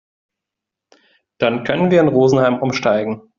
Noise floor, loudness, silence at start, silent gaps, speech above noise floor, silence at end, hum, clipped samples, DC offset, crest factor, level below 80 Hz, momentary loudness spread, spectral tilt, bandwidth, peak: -84 dBFS; -16 LUFS; 1.4 s; none; 68 dB; 0.2 s; none; under 0.1%; under 0.1%; 16 dB; -56 dBFS; 6 LU; -5.5 dB/octave; 7.4 kHz; -2 dBFS